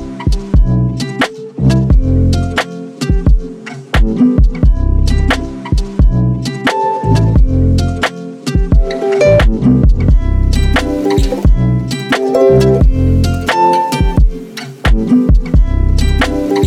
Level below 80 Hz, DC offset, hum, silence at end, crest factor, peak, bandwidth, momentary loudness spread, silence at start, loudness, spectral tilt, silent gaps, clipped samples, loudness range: -14 dBFS; under 0.1%; none; 0 s; 10 dB; 0 dBFS; 12.5 kHz; 7 LU; 0 s; -13 LUFS; -7 dB/octave; none; under 0.1%; 2 LU